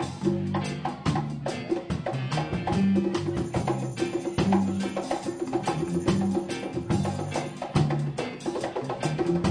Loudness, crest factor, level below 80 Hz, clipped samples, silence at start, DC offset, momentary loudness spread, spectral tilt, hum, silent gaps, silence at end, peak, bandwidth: -28 LUFS; 16 dB; -48 dBFS; under 0.1%; 0 s; under 0.1%; 7 LU; -6.5 dB/octave; none; none; 0 s; -10 dBFS; 10 kHz